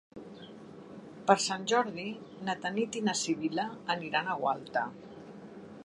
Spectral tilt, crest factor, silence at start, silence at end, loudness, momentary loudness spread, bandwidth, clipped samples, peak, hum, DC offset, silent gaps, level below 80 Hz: -3.5 dB/octave; 24 dB; 0.15 s; 0 s; -32 LUFS; 21 LU; 11.5 kHz; under 0.1%; -8 dBFS; none; under 0.1%; none; -74 dBFS